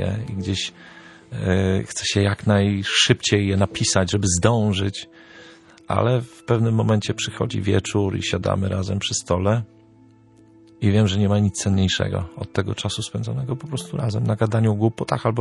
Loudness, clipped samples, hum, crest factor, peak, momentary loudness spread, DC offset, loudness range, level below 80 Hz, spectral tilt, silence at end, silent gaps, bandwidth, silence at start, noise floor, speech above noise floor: -21 LUFS; under 0.1%; none; 20 dB; -2 dBFS; 9 LU; under 0.1%; 4 LU; -48 dBFS; -5 dB/octave; 0 s; none; 11.5 kHz; 0 s; -51 dBFS; 30 dB